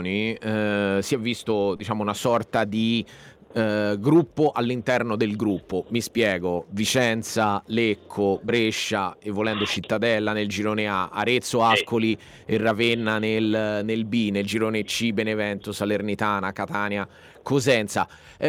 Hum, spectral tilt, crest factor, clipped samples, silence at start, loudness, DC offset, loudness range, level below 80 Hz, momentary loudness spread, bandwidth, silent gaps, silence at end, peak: none; -5 dB/octave; 18 dB; under 0.1%; 0 s; -24 LUFS; under 0.1%; 2 LU; -60 dBFS; 7 LU; 16.5 kHz; none; 0 s; -6 dBFS